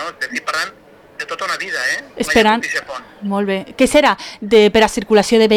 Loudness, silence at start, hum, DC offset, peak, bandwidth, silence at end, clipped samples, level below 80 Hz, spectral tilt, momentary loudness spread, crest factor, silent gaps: -16 LUFS; 0 s; none; under 0.1%; -2 dBFS; 17.5 kHz; 0 s; under 0.1%; -44 dBFS; -3.5 dB/octave; 12 LU; 12 dB; none